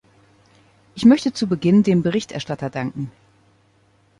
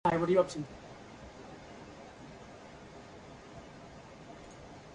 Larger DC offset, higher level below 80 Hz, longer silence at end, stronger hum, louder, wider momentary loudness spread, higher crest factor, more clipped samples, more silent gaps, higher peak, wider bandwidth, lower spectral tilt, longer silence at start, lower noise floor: neither; first, -56 dBFS vs -62 dBFS; first, 1.1 s vs 0 s; neither; first, -19 LUFS vs -31 LUFS; second, 15 LU vs 22 LU; second, 18 dB vs 24 dB; neither; neither; first, -2 dBFS vs -14 dBFS; about the same, 11 kHz vs 11 kHz; about the same, -6.5 dB/octave vs -6.5 dB/octave; first, 0.95 s vs 0.05 s; first, -58 dBFS vs -51 dBFS